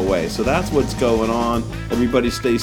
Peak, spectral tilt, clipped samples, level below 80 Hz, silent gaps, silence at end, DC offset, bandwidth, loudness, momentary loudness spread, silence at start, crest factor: -4 dBFS; -5.5 dB/octave; under 0.1%; -32 dBFS; none; 0 s; under 0.1%; 18 kHz; -19 LUFS; 4 LU; 0 s; 16 dB